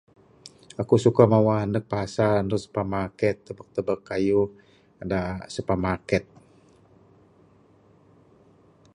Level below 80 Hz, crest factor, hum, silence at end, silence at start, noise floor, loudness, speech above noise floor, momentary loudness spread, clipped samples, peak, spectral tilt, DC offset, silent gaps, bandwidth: -50 dBFS; 24 dB; none; 2.7 s; 0.45 s; -57 dBFS; -24 LUFS; 34 dB; 14 LU; under 0.1%; -2 dBFS; -7.5 dB/octave; under 0.1%; none; 11 kHz